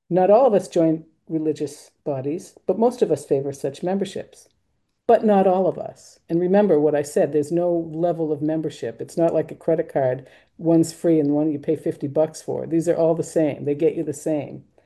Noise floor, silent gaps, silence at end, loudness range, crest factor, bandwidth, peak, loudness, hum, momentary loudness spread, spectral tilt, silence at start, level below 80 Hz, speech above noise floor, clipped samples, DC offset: -72 dBFS; none; 0.25 s; 4 LU; 16 dB; 12.5 kHz; -4 dBFS; -21 LUFS; none; 12 LU; -7 dB/octave; 0.1 s; -64 dBFS; 51 dB; under 0.1%; under 0.1%